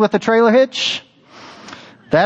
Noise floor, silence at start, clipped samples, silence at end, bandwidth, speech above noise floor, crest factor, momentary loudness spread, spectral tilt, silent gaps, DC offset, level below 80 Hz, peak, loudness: -41 dBFS; 0 s; under 0.1%; 0 s; 8.2 kHz; 27 dB; 16 dB; 24 LU; -4.5 dB/octave; none; under 0.1%; -56 dBFS; -2 dBFS; -15 LUFS